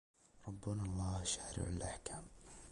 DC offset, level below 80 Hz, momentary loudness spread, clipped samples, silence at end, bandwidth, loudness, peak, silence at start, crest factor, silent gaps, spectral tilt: under 0.1%; -54 dBFS; 15 LU; under 0.1%; 0 s; 11.5 kHz; -43 LUFS; -26 dBFS; 0.35 s; 18 dB; none; -4.5 dB/octave